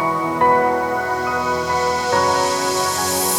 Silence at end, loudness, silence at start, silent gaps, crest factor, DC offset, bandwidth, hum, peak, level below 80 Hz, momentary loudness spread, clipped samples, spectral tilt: 0 s; -18 LUFS; 0 s; none; 14 dB; under 0.1%; over 20 kHz; none; -4 dBFS; -48 dBFS; 5 LU; under 0.1%; -2.5 dB/octave